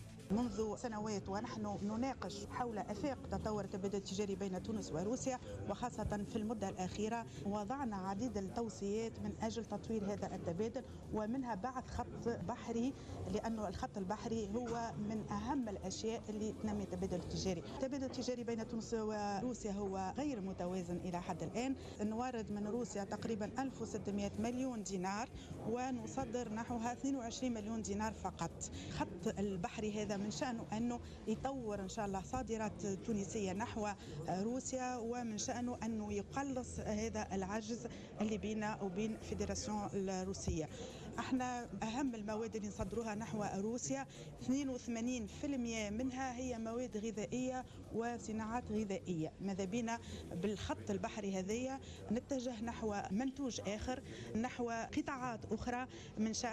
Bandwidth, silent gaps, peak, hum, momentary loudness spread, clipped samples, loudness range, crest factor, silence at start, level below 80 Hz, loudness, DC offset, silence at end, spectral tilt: 12.5 kHz; none; -28 dBFS; none; 3 LU; under 0.1%; 1 LU; 12 dB; 0 s; -60 dBFS; -42 LUFS; under 0.1%; 0 s; -5.5 dB/octave